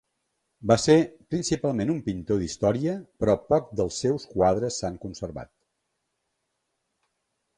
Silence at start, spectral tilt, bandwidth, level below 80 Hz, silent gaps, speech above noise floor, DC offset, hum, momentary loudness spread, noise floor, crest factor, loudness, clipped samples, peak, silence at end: 0.6 s; -5.5 dB/octave; 11 kHz; -50 dBFS; none; 54 dB; under 0.1%; none; 14 LU; -78 dBFS; 20 dB; -25 LUFS; under 0.1%; -6 dBFS; 2.15 s